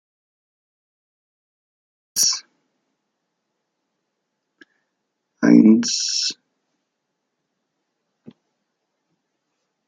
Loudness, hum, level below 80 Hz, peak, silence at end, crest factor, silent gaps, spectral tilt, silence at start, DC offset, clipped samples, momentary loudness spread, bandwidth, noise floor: -17 LUFS; none; -72 dBFS; -2 dBFS; 3.55 s; 22 dB; none; -3.5 dB/octave; 2.15 s; under 0.1%; under 0.1%; 15 LU; 11.5 kHz; -77 dBFS